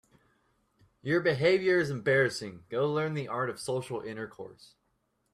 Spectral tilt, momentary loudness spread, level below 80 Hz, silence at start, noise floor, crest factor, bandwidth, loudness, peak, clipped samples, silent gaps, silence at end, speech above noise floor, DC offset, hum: -5.5 dB/octave; 15 LU; -68 dBFS; 1.05 s; -76 dBFS; 18 dB; 13 kHz; -29 LUFS; -14 dBFS; under 0.1%; none; 0.8 s; 46 dB; under 0.1%; none